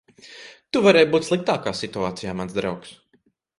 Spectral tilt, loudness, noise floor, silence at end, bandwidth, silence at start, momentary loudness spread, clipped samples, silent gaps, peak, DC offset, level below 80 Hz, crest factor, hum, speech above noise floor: -5 dB/octave; -21 LUFS; -64 dBFS; 0.7 s; 11.5 kHz; 0.25 s; 22 LU; under 0.1%; none; -2 dBFS; under 0.1%; -56 dBFS; 20 dB; none; 43 dB